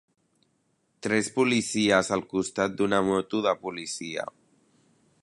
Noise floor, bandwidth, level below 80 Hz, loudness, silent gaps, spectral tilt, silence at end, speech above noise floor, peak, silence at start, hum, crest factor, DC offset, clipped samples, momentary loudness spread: -71 dBFS; 11.5 kHz; -62 dBFS; -26 LUFS; none; -4 dB/octave; 0.95 s; 45 dB; -6 dBFS; 1.05 s; none; 20 dB; under 0.1%; under 0.1%; 11 LU